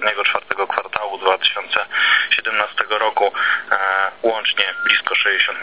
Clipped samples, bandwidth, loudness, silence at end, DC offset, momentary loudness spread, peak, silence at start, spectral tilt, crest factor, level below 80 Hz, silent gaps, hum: under 0.1%; 4 kHz; -17 LUFS; 0 s; 0.4%; 6 LU; 0 dBFS; 0 s; -4 dB/octave; 18 dB; -64 dBFS; none; none